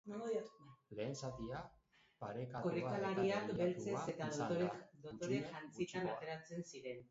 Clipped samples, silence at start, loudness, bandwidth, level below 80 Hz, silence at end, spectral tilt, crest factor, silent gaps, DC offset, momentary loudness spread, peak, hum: under 0.1%; 0.05 s; -43 LUFS; 7.6 kHz; -72 dBFS; 0.05 s; -5.5 dB/octave; 16 dB; none; under 0.1%; 12 LU; -26 dBFS; none